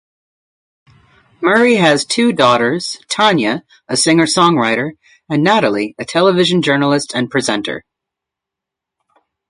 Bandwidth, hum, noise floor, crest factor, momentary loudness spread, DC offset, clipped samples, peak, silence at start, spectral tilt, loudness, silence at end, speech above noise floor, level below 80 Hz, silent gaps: 11.5 kHz; none; -83 dBFS; 16 dB; 9 LU; under 0.1%; under 0.1%; 0 dBFS; 1.4 s; -4 dB/octave; -14 LUFS; 1.7 s; 69 dB; -58 dBFS; none